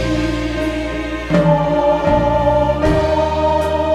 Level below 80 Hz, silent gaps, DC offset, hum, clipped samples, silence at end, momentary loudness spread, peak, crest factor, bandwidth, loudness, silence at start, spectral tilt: -26 dBFS; none; under 0.1%; none; under 0.1%; 0 s; 6 LU; -2 dBFS; 14 dB; 13 kHz; -16 LUFS; 0 s; -7 dB/octave